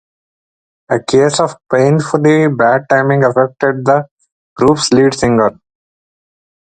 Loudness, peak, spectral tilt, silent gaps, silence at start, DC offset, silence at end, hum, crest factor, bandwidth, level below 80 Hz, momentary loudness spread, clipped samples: -12 LUFS; 0 dBFS; -5.5 dB/octave; 4.11-4.17 s, 4.32-4.56 s; 0.9 s; under 0.1%; 1.25 s; none; 14 dB; 9.4 kHz; -48 dBFS; 5 LU; under 0.1%